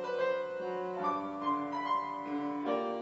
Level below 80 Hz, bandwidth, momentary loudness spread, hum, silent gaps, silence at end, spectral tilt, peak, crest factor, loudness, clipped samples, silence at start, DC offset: -76 dBFS; 7.6 kHz; 4 LU; none; none; 0 s; -3.5 dB/octave; -20 dBFS; 14 dB; -35 LUFS; under 0.1%; 0 s; under 0.1%